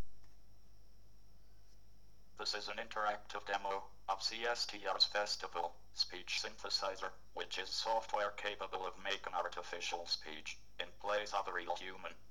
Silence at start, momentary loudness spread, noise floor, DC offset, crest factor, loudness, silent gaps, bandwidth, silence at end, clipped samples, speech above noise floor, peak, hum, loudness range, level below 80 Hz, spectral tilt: 0 s; 10 LU; -66 dBFS; 0.3%; 24 dB; -40 LUFS; none; 19.5 kHz; 0.15 s; under 0.1%; 25 dB; -18 dBFS; none; 6 LU; -66 dBFS; -0.5 dB/octave